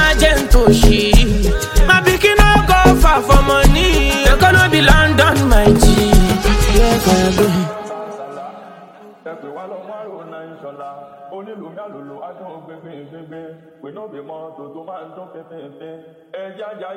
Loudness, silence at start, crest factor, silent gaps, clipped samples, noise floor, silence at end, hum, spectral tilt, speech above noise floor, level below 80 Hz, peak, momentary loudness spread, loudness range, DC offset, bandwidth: -12 LUFS; 0 s; 14 dB; none; under 0.1%; -40 dBFS; 0 s; none; -4.5 dB/octave; 19 dB; -18 dBFS; 0 dBFS; 24 LU; 22 LU; under 0.1%; 17 kHz